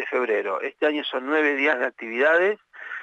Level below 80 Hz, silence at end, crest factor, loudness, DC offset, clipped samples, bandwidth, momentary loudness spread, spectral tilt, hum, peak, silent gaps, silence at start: -88 dBFS; 0 s; 16 dB; -23 LUFS; under 0.1%; under 0.1%; 8 kHz; 8 LU; -4 dB/octave; none; -8 dBFS; none; 0 s